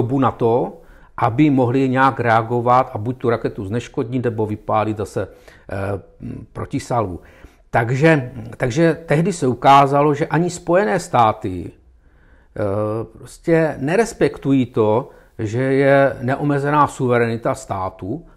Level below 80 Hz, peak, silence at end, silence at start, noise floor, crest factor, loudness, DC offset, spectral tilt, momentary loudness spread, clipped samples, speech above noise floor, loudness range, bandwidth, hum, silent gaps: -46 dBFS; -4 dBFS; 0.15 s; 0 s; -50 dBFS; 14 dB; -18 LUFS; under 0.1%; -7 dB/octave; 13 LU; under 0.1%; 32 dB; 7 LU; 13.5 kHz; none; none